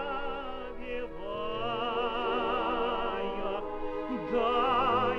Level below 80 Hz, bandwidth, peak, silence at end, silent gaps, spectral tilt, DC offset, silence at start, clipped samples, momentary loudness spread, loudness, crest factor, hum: -46 dBFS; 6.6 kHz; -16 dBFS; 0 s; none; -6.5 dB/octave; under 0.1%; 0 s; under 0.1%; 12 LU; -32 LUFS; 16 dB; 50 Hz at -60 dBFS